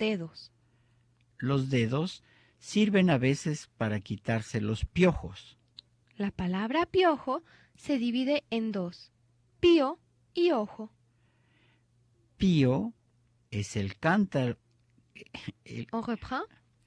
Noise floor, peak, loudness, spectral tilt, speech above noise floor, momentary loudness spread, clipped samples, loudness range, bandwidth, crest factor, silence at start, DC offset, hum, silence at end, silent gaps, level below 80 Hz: -68 dBFS; -12 dBFS; -29 LUFS; -6.5 dB/octave; 39 dB; 19 LU; under 0.1%; 4 LU; 10.5 kHz; 18 dB; 0 s; under 0.1%; none; 0.4 s; none; -54 dBFS